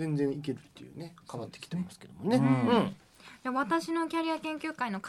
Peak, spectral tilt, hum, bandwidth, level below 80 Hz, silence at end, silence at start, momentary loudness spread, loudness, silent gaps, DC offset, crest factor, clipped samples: -16 dBFS; -6.5 dB/octave; none; 13 kHz; -72 dBFS; 0 s; 0 s; 18 LU; -31 LUFS; none; under 0.1%; 16 dB; under 0.1%